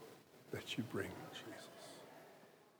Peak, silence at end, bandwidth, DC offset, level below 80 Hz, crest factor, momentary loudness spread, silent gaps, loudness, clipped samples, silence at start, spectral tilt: -28 dBFS; 0 s; over 20 kHz; under 0.1%; -88 dBFS; 22 dB; 17 LU; none; -48 LUFS; under 0.1%; 0 s; -4.5 dB/octave